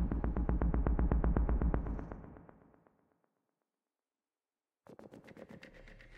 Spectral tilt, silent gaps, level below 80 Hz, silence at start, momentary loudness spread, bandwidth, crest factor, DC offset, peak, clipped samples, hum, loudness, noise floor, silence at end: -10.5 dB/octave; none; -38 dBFS; 0 s; 23 LU; 3.1 kHz; 22 dB; under 0.1%; -16 dBFS; under 0.1%; none; -35 LUFS; under -90 dBFS; 0 s